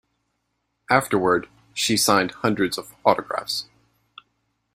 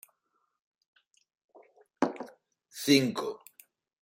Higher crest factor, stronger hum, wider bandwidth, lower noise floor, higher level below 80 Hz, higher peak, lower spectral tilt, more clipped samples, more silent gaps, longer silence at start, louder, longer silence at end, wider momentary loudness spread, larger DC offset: about the same, 24 dB vs 26 dB; neither; about the same, 16 kHz vs 16 kHz; about the same, -75 dBFS vs -78 dBFS; first, -60 dBFS vs -78 dBFS; first, 0 dBFS vs -8 dBFS; about the same, -3.5 dB/octave vs -4 dB/octave; neither; neither; second, 0.9 s vs 2 s; first, -22 LUFS vs -29 LUFS; first, 1.1 s vs 0.75 s; second, 8 LU vs 23 LU; neither